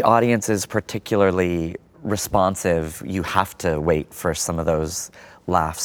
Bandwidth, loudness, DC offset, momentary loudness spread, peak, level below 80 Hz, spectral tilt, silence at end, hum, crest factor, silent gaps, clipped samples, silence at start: over 20 kHz; -22 LUFS; under 0.1%; 9 LU; -2 dBFS; -42 dBFS; -5 dB/octave; 0 s; none; 20 dB; none; under 0.1%; 0 s